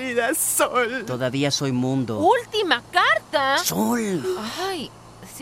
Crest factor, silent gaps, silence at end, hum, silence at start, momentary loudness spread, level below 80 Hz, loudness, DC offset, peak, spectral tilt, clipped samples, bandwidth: 20 dB; none; 0 s; none; 0 s; 9 LU; -58 dBFS; -21 LUFS; under 0.1%; -4 dBFS; -3.5 dB/octave; under 0.1%; 16 kHz